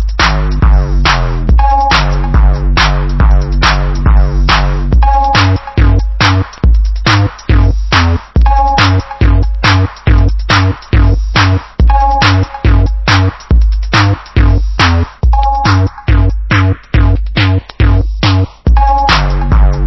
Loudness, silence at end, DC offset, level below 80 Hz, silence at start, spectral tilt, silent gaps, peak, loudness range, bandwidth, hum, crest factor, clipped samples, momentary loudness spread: -10 LUFS; 0 s; under 0.1%; -10 dBFS; 0 s; -5.5 dB/octave; none; 0 dBFS; 1 LU; 6.2 kHz; none; 8 dB; 0.3%; 3 LU